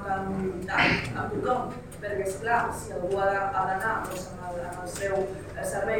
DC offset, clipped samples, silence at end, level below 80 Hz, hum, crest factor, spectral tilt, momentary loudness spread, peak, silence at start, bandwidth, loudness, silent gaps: under 0.1%; under 0.1%; 0 s; -48 dBFS; none; 20 dB; -4.5 dB/octave; 11 LU; -10 dBFS; 0 s; 18 kHz; -29 LUFS; none